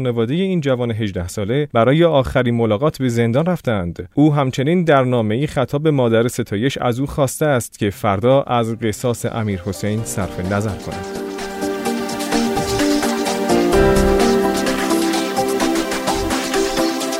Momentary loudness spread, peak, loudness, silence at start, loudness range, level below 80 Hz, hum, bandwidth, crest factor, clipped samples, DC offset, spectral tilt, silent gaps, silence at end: 8 LU; -2 dBFS; -18 LUFS; 0 s; 5 LU; -36 dBFS; none; 16 kHz; 16 dB; under 0.1%; under 0.1%; -5.5 dB/octave; none; 0 s